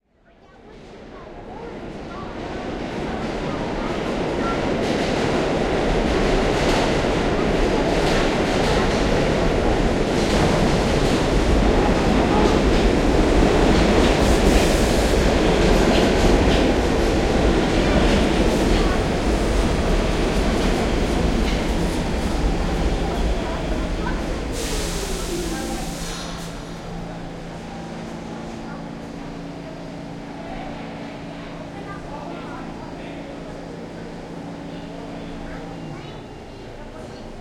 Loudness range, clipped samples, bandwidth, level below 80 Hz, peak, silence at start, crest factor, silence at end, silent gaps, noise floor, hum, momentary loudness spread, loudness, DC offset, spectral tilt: 16 LU; under 0.1%; 16 kHz; -26 dBFS; -2 dBFS; 0.65 s; 18 dB; 0 s; none; -53 dBFS; none; 17 LU; -20 LUFS; under 0.1%; -5.5 dB/octave